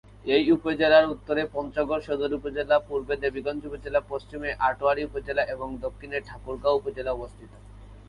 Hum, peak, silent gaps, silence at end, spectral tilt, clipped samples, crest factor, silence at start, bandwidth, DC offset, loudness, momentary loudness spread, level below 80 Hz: none; -6 dBFS; none; 0.1 s; -6.5 dB/octave; under 0.1%; 22 dB; 0.25 s; 10.5 kHz; under 0.1%; -26 LUFS; 13 LU; -48 dBFS